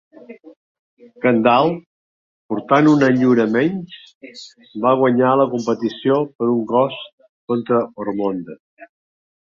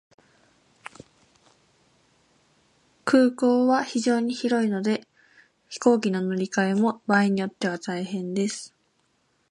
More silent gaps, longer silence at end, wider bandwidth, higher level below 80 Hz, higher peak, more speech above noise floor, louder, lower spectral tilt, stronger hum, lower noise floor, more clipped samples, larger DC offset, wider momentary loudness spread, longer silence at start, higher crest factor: first, 0.56-0.97 s, 1.86-2.49 s, 4.15-4.21 s, 6.35-6.39 s, 7.13-7.18 s, 7.29-7.48 s, 8.60-8.77 s vs none; second, 0.7 s vs 0.85 s; second, 7.4 kHz vs 11.5 kHz; first, -62 dBFS vs -72 dBFS; first, -2 dBFS vs -6 dBFS; first, over 73 dB vs 46 dB; first, -17 LUFS vs -24 LUFS; first, -7 dB/octave vs -5.5 dB/octave; neither; first, under -90 dBFS vs -69 dBFS; neither; neither; first, 23 LU vs 17 LU; second, 0.3 s vs 3.05 s; about the same, 18 dB vs 20 dB